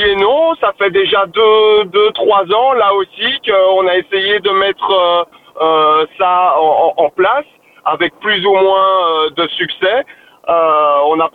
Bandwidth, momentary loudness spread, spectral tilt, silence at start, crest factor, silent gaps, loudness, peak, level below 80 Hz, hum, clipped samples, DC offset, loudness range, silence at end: 4.5 kHz; 6 LU; -5.5 dB/octave; 0 s; 12 dB; none; -12 LUFS; 0 dBFS; -50 dBFS; none; under 0.1%; under 0.1%; 2 LU; 0.05 s